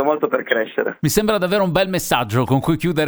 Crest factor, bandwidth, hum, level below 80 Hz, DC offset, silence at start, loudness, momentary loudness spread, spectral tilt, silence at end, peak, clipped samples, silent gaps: 18 dB; over 20 kHz; none; -44 dBFS; under 0.1%; 0 s; -18 LUFS; 3 LU; -5 dB/octave; 0 s; 0 dBFS; under 0.1%; none